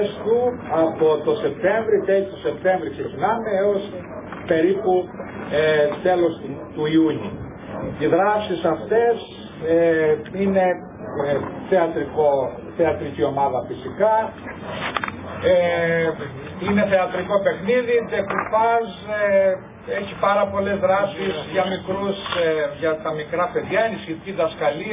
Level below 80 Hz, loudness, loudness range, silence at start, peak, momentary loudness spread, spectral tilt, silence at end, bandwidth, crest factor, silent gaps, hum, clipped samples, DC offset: -50 dBFS; -21 LUFS; 2 LU; 0 s; -4 dBFS; 11 LU; -10 dB/octave; 0 s; 3.8 kHz; 18 dB; none; none; under 0.1%; under 0.1%